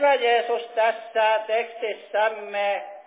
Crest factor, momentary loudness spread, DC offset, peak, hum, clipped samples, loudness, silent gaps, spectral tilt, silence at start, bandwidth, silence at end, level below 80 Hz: 14 dB; 6 LU; under 0.1%; -10 dBFS; none; under 0.1%; -24 LUFS; none; -5 dB/octave; 0 s; 4 kHz; 0.05 s; under -90 dBFS